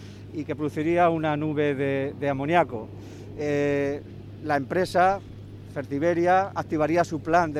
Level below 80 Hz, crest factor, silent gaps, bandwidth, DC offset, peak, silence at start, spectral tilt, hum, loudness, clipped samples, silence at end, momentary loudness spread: -54 dBFS; 18 dB; none; 13.5 kHz; under 0.1%; -6 dBFS; 0 s; -7 dB/octave; none; -25 LUFS; under 0.1%; 0 s; 15 LU